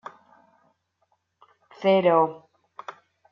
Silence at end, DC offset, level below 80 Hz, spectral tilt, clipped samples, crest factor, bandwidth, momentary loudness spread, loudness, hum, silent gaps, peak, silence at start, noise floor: 0.4 s; under 0.1%; -80 dBFS; -7.5 dB/octave; under 0.1%; 20 dB; 6.8 kHz; 24 LU; -22 LUFS; none; none; -6 dBFS; 1.8 s; -72 dBFS